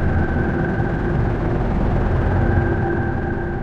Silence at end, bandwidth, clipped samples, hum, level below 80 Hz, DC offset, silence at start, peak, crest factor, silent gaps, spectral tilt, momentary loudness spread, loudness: 0 s; 6.4 kHz; under 0.1%; none; -24 dBFS; under 0.1%; 0 s; -4 dBFS; 14 dB; none; -9.5 dB/octave; 3 LU; -20 LUFS